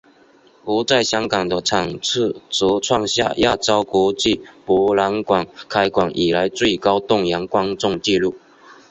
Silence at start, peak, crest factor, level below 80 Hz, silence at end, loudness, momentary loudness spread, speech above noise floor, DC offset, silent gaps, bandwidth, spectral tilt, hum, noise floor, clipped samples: 0.65 s; -2 dBFS; 18 dB; -48 dBFS; 0.2 s; -18 LUFS; 4 LU; 33 dB; under 0.1%; none; 8.4 kHz; -4 dB/octave; none; -51 dBFS; under 0.1%